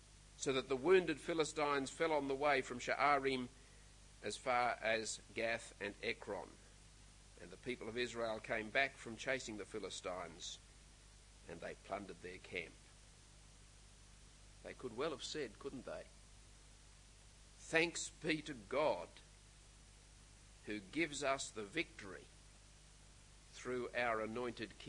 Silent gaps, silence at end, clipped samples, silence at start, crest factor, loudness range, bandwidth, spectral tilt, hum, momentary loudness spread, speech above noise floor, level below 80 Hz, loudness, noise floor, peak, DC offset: none; 0 s; under 0.1%; 0 s; 24 dB; 11 LU; 11 kHz; -3.5 dB/octave; 50 Hz at -65 dBFS; 26 LU; 22 dB; -66 dBFS; -41 LUFS; -63 dBFS; -18 dBFS; under 0.1%